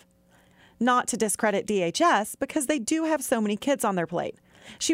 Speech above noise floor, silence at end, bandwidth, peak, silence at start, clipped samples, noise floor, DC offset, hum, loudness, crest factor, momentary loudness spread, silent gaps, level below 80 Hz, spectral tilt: 35 dB; 0 s; 16 kHz; -8 dBFS; 0.8 s; under 0.1%; -60 dBFS; under 0.1%; none; -25 LUFS; 18 dB; 7 LU; none; -64 dBFS; -3.5 dB/octave